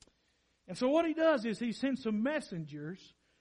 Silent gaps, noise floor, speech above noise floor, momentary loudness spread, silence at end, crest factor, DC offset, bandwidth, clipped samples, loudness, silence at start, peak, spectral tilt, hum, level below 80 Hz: none; -75 dBFS; 42 dB; 16 LU; 0.35 s; 18 dB; under 0.1%; 11 kHz; under 0.1%; -33 LUFS; 0.7 s; -18 dBFS; -6 dB/octave; none; -72 dBFS